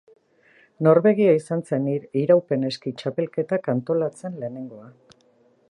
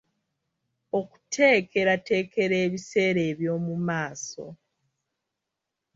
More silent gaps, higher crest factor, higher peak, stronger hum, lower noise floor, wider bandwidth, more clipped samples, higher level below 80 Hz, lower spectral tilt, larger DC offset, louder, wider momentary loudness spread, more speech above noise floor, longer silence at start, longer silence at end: neither; about the same, 20 dB vs 20 dB; first, -2 dBFS vs -8 dBFS; neither; second, -60 dBFS vs -85 dBFS; first, 11 kHz vs 7.8 kHz; neither; about the same, -72 dBFS vs -68 dBFS; first, -8 dB/octave vs -5 dB/octave; neither; first, -22 LUFS vs -25 LUFS; about the same, 15 LU vs 14 LU; second, 38 dB vs 60 dB; second, 0.8 s vs 0.95 s; second, 0.85 s vs 1.4 s